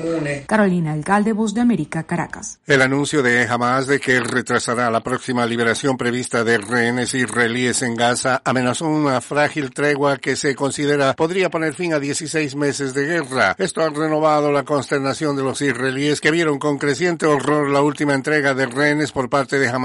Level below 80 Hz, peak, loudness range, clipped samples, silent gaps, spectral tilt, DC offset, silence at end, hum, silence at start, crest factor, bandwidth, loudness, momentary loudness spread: -56 dBFS; -4 dBFS; 1 LU; under 0.1%; none; -4.5 dB/octave; under 0.1%; 0 s; none; 0 s; 14 dB; 11.5 kHz; -18 LUFS; 5 LU